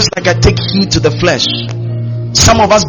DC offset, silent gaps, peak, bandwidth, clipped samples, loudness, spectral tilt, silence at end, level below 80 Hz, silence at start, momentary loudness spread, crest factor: under 0.1%; none; 0 dBFS; over 20 kHz; 0.3%; -11 LUFS; -4 dB/octave; 0 s; -26 dBFS; 0 s; 11 LU; 10 dB